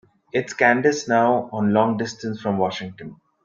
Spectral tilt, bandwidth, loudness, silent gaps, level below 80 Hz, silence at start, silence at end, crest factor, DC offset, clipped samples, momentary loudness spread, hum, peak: -5.5 dB/octave; 7.6 kHz; -21 LUFS; none; -62 dBFS; 0.35 s; 0.3 s; 20 dB; under 0.1%; under 0.1%; 14 LU; none; -2 dBFS